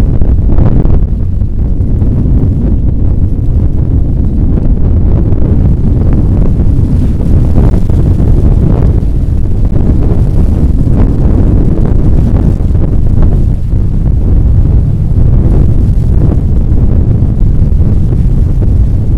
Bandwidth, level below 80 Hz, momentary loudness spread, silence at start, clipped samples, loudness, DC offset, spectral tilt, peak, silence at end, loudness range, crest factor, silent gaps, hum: 3.2 kHz; -8 dBFS; 3 LU; 0 s; 3%; -10 LUFS; under 0.1%; -11 dB/octave; 0 dBFS; 0 s; 1 LU; 6 dB; none; none